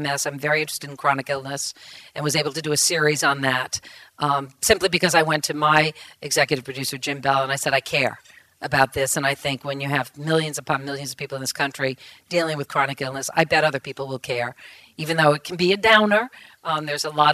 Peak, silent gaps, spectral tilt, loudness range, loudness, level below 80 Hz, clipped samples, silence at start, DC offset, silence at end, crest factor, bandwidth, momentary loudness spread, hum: 0 dBFS; none; -3 dB/octave; 4 LU; -21 LUFS; -56 dBFS; under 0.1%; 0 s; under 0.1%; 0 s; 22 dB; 15.5 kHz; 12 LU; none